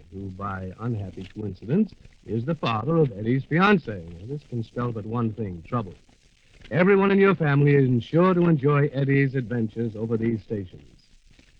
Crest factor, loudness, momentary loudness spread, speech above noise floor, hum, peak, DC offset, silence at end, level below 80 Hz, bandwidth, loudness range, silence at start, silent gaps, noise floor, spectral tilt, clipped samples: 18 dB; -23 LUFS; 16 LU; 33 dB; none; -6 dBFS; under 0.1%; 0.85 s; -52 dBFS; 6.4 kHz; 7 LU; 0.1 s; none; -56 dBFS; -9.5 dB/octave; under 0.1%